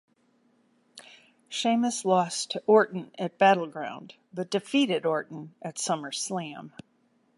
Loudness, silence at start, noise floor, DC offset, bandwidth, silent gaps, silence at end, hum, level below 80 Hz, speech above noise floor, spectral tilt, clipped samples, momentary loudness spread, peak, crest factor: -27 LUFS; 0.95 s; -68 dBFS; under 0.1%; 11.5 kHz; none; 0.7 s; none; -80 dBFS; 41 dB; -4 dB/octave; under 0.1%; 17 LU; -8 dBFS; 20 dB